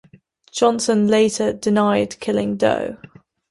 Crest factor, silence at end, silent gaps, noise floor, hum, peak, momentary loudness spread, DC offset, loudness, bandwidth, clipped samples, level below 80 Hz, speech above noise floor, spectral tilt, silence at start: 16 dB; 0.55 s; none; -51 dBFS; none; -4 dBFS; 10 LU; under 0.1%; -18 LUFS; 11.5 kHz; under 0.1%; -56 dBFS; 33 dB; -5 dB/octave; 0.55 s